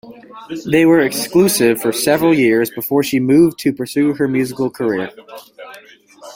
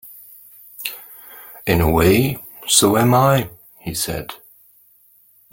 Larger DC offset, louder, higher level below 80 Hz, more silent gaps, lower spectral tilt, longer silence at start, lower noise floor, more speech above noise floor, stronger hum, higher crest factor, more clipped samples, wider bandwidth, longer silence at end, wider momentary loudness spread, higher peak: neither; about the same, -15 LUFS vs -17 LUFS; second, -54 dBFS vs -40 dBFS; neither; about the same, -5 dB/octave vs -4.5 dB/octave; about the same, 0.05 s vs 0.05 s; second, -40 dBFS vs -53 dBFS; second, 25 dB vs 38 dB; neither; second, 14 dB vs 20 dB; neither; about the same, 16.5 kHz vs 17 kHz; second, 0 s vs 1.15 s; second, 16 LU vs 23 LU; about the same, -2 dBFS vs 0 dBFS